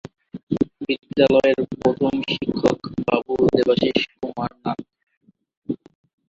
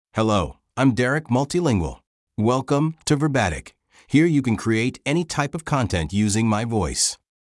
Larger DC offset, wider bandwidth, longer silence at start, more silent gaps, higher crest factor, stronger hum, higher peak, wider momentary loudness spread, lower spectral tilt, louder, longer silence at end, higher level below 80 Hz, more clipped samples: neither; second, 7.8 kHz vs 12 kHz; first, 0.35 s vs 0.15 s; second, 0.43-0.47 s, 5.17-5.21 s, 5.57-5.62 s vs 2.07-2.27 s; about the same, 20 dB vs 16 dB; neither; about the same, -2 dBFS vs -4 dBFS; first, 14 LU vs 6 LU; first, -6.5 dB/octave vs -5 dB/octave; about the same, -21 LUFS vs -22 LUFS; first, 0.55 s vs 0.35 s; second, -50 dBFS vs -44 dBFS; neither